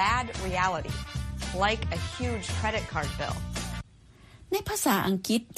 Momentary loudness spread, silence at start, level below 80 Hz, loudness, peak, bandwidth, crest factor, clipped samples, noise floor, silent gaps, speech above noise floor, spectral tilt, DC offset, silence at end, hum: 9 LU; 0 s; -40 dBFS; -30 LUFS; -10 dBFS; 15 kHz; 18 dB; under 0.1%; -54 dBFS; none; 25 dB; -4 dB/octave; under 0.1%; 0 s; none